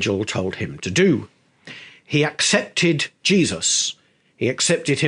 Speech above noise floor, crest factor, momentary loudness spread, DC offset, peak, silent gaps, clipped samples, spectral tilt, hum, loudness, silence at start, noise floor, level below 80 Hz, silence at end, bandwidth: 22 dB; 20 dB; 10 LU; under 0.1%; 0 dBFS; none; under 0.1%; -3.5 dB/octave; none; -20 LUFS; 0 s; -42 dBFS; -58 dBFS; 0 s; 10.5 kHz